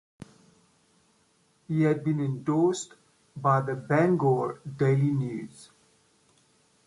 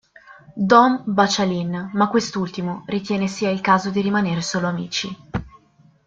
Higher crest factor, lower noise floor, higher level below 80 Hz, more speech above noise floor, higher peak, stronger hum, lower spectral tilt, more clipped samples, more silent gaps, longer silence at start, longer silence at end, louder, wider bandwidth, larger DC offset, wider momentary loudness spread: about the same, 18 dB vs 18 dB; first, -67 dBFS vs -55 dBFS; second, -68 dBFS vs -52 dBFS; first, 41 dB vs 35 dB; second, -10 dBFS vs -2 dBFS; neither; first, -7.5 dB/octave vs -5 dB/octave; neither; neither; first, 1.7 s vs 0.3 s; first, 1.2 s vs 0.6 s; second, -27 LUFS vs -20 LUFS; first, 11.5 kHz vs 7.8 kHz; neither; about the same, 12 LU vs 13 LU